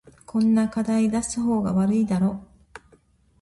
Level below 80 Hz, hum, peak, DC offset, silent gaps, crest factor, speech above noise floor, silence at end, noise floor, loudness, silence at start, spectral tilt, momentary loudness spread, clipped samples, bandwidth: -52 dBFS; none; -12 dBFS; under 0.1%; none; 12 dB; 37 dB; 0.65 s; -59 dBFS; -23 LUFS; 0.35 s; -6.5 dB/octave; 5 LU; under 0.1%; 11.5 kHz